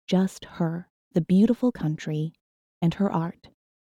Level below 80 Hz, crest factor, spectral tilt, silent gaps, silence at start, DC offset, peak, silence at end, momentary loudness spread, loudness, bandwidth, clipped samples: -58 dBFS; 16 dB; -8 dB/octave; 0.90-1.11 s, 2.41-2.81 s; 0.1 s; under 0.1%; -10 dBFS; 0.55 s; 10 LU; -26 LUFS; 11.5 kHz; under 0.1%